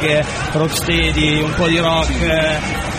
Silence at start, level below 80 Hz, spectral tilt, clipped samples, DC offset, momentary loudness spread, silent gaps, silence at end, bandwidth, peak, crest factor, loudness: 0 s; -26 dBFS; -4.5 dB/octave; under 0.1%; under 0.1%; 4 LU; none; 0 s; 15.5 kHz; -2 dBFS; 14 dB; -16 LUFS